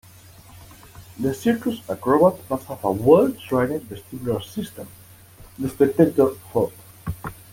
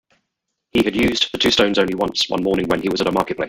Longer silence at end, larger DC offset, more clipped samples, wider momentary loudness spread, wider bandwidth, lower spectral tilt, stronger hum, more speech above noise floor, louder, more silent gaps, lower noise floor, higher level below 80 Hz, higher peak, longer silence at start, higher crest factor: first, 0.2 s vs 0 s; neither; neither; first, 18 LU vs 4 LU; about the same, 17 kHz vs 17 kHz; first, -7 dB/octave vs -4 dB/octave; neither; second, 26 dB vs 59 dB; second, -22 LUFS vs -18 LUFS; neither; second, -47 dBFS vs -77 dBFS; second, -52 dBFS vs -46 dBFS; about the same, -2 dBFS vs -2 dBFS; second, 0.55 s vs 0.75 s; about the same, 20 dB vs 18 dB